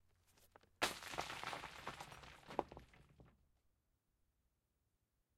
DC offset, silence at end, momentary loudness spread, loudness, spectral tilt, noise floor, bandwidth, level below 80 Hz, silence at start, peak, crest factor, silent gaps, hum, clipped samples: under 0.1%; 2.05 s; 18 LU; -47 LUFS; -2.5 dB/octave; -86 dBFS; 16 kHz; -72 dBFS; 0.3 s; -22 dBFS; 30 dB; none; none; under 0.1%